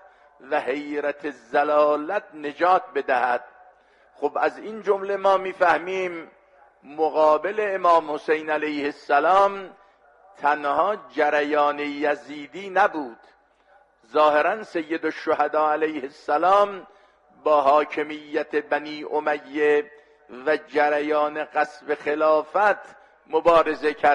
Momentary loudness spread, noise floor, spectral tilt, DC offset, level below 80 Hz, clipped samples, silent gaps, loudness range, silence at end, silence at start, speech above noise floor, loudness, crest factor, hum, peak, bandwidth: 10 LU; -58 dBFS; -5 dB/octave; under 0.1%; -66 dBFS; under 0.1%; none; 3 LU; 0 s; 0.45 s; 36 dB; -22 LUFS; 18 dB; none; -6 dBFS; 10 kHz